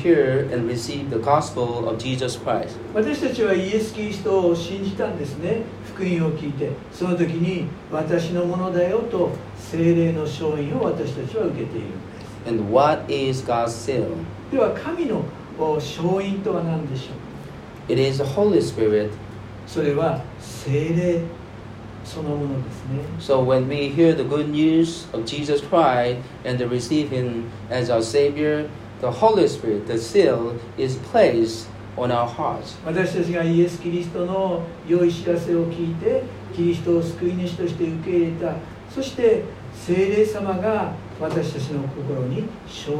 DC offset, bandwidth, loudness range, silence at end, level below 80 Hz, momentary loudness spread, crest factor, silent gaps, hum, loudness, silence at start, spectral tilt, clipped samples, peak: under 0.1%; 13 kHz; 4 LU; 0 s; -50 dBFS; 12 LU; 18 dB; none; none; -22 LUFS; 0 s; -6.5 dB/octave; under 0.1%; -4 dBFS